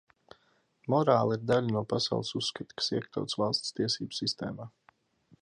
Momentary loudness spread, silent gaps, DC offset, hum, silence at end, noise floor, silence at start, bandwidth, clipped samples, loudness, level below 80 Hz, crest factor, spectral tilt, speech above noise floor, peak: 11 LU; none; under 0.1%; none; 0.75 s; -70 dBFS; 0.85 s; 11.5 kHz; under 0.1%; -30 LUFS; -68 dBFS; 22 dB; -5 dB/octave; 39 dB; -10 dBFS